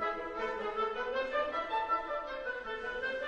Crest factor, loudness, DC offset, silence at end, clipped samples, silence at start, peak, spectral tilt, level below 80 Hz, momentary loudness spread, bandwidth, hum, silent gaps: 14 dB; -35 LUFS; under 0.1%; 0 s; under 0.1%; 0 s; -22 dBFS; -4 dB/octave; -60 dBFS; 5 LU; 9.4 kHz; none; none